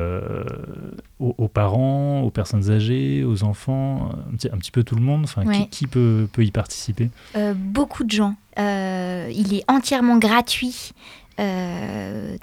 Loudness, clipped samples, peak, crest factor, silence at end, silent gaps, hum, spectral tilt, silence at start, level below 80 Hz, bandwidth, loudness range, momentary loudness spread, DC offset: -21 LUFS; under 0.1%; -2 dBFS; 18 dB; 0.05 s; none; none; -6.5 dB/octave; 0 s; -46 dBFS; 15.5 kHz; 2 LU; 10 LU; under 0.1%